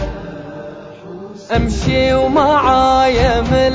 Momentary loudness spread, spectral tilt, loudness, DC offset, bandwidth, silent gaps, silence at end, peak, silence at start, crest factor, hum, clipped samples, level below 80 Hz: 20 LU; -6 dB/octave; -13 LUFS; under 0.1%; 7.8 kHz; none; 0 s; 0 dBFS; 0 s; 14 dB; none; under 0.1%; -26 dBFS